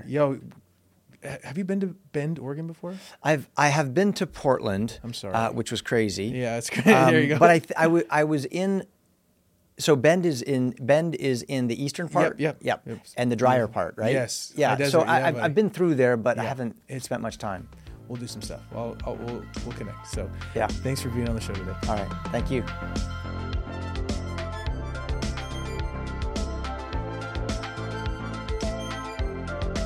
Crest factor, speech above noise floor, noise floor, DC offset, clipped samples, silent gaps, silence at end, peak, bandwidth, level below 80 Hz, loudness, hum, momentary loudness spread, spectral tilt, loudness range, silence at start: 22 dB; 40 dB; -65 dBFS; under 0.1%; under 0.1%; none; 0 s; -4 dBFS; 16.5 kHz; -40 dBFS; -26 LUFS; none; 14 LU; -5.5 dB/octave; 11 LU; 0 s